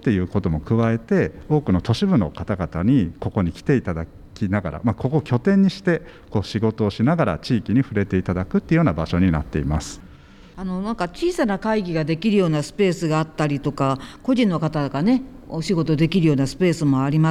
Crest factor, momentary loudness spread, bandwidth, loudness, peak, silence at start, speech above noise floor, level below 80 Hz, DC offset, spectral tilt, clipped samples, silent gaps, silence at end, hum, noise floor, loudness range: 12 dB; 8 LU; 12 kHz; -21 LUFS; -8 dBFS; 0 s; 25 dB; -40 dBFS; under 0.1%; -7.5 dB/octave; under 0.1%; none; 0 s; none; -45 dBFS; 2 LU